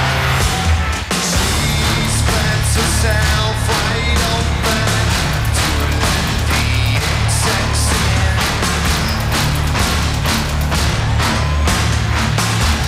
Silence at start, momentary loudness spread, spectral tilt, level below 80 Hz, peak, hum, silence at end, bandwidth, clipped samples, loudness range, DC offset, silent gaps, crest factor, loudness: 0 s; 2 LU; -4 dB/octave; -20 dBFS; -4 dBFS; none; 0 s; 16 kHz; under 0.1%; 1 LU; under 0.1%; none; 12 dB; -15 LUFS